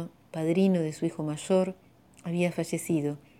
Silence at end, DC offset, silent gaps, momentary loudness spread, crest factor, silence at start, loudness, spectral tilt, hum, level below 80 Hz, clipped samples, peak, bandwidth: 0.25 s; under 0.1%; none; 9 LU; 16 dB; 0 s; -29 LUFS; -6.5 dB/octave; none; -68 dBFS; under 0.1%; -14 dBFS; 15.5 kHz